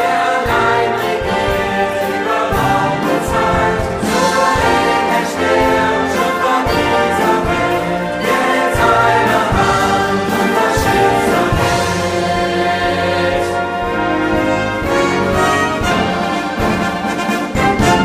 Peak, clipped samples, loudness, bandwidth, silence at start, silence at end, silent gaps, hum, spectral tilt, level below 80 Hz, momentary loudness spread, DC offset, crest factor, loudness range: 0 dBFS; under 0.1%; -14 LUFS; 16 kHz; 0 s; 0 s; none; none; -5 dB/octave; -32 dBFS; 4 LU; under 0.1%; 14 dB; 2 LU